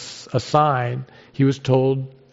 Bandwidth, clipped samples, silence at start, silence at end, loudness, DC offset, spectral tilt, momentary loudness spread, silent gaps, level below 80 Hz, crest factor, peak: 8 kHz; under 0.1%; 0 s; 0.2 s; -20 LUFS; under 0.1%; -6.5 dB/octave; 10 LU; none; -60 dBFS; 18 dB; -4 dBFS